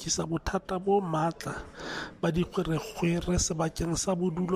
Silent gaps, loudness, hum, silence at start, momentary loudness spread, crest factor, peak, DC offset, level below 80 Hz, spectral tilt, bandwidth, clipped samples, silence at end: none; -30 LUFS; none; 0 s; 10 LU; 14 dB; -14 dBFS; under 0.1%; -44 dBFS; -5 dB/octave; 15 kHz; under 0.1%; 0 s